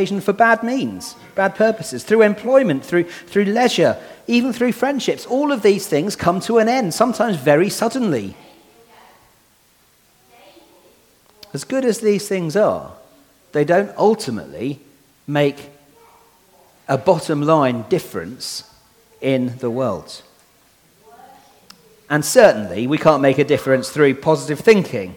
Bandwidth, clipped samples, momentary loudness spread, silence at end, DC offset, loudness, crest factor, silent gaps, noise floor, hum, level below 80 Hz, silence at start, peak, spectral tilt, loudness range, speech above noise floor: 19 kHz; under 0.1%; 13 LU; 0 s; under 0.1%; -17 LUFS; 18 dB; none; -56 dBFS; none; -58 dBFS; 0 s; 0 dBFS; -5 dB/octave; 9 LU; 39 dB